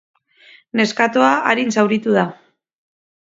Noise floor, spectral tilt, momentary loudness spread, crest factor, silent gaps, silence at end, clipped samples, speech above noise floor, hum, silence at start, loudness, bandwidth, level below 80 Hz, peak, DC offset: -49 dBFS; -5 dB/octave; 6 LU; 18 dB; none; 0.9 s; under 0.1%; 33 dB; none; 0.75 s; -16 LUFS; 7.8 kHz; -66 dBFS; 0 dBFS; under 0.1%